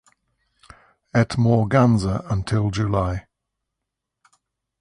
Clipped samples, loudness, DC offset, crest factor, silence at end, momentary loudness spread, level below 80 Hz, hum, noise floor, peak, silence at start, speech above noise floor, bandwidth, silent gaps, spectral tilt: under 0.1%; -21 LUFS; under 0.1%; 18 dB; 1.6 s; 8 LU; -42 dBFS; none; -82 dBFS; -4 dBFS; 1.15 s; 63 dB; 10.5 kHz; none; -7.5 dB/octave